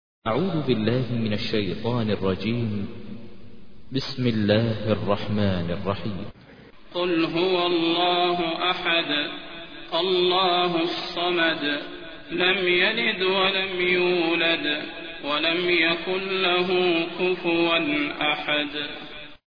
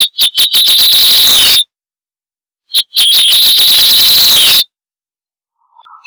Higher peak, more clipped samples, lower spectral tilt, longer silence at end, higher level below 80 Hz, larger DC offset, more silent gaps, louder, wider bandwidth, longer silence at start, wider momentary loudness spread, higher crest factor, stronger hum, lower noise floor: about the same, -6 dBFS vs -6 dBFS; neither; first, -7 dB/octave vs 2 dB/octave; second, 0.1 s vs 1.45 s; second, -54 dBFS vs -46 dBFS; first, 0.6% vs under 0.1%; neither; second, -23 LUFS vs -4 LUFS; second, 5.4 kHz vs over 20 kHz; first, 0.2 s vs 0 s; first, 12 LU vs 8 LU; first, 18 dB vs 4 dB; neither; second, -48 dBFS vs under -90 dBFS